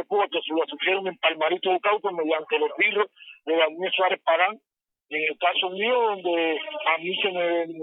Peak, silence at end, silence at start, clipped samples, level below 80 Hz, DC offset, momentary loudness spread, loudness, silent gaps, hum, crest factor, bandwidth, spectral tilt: -8 dBFS; 0 s; 0 s; under 0.1%; -88 dBFS; under 0.1%; 5 LU; -24 LUFS; none; none; 18 dB; 4 kHz; -7 dB/octave